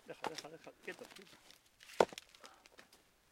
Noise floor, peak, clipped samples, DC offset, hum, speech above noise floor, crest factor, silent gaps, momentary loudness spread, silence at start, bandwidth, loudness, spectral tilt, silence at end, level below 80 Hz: -68 dBFS; -10 dBFS; under 0.1%; under 0.1%; none; 17 dB; 34 dB; none; 25 LU; 0.05 s; 16.5 kHz; -41 LUFS; -3.5 dB/octave; 0.5 s; -80 dBFS